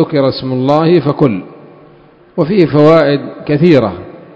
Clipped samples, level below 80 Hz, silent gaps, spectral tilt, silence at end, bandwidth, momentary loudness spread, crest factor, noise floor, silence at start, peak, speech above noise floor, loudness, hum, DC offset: 0.7%; -46 dBFS; none; -9 dB/octave; 0.2 s; 8 kHz; 11 LU; 12 dB; -42 dBFS; 0 s; 0 dBFS; 32 dB; -11 LUFS; none; under 0.1%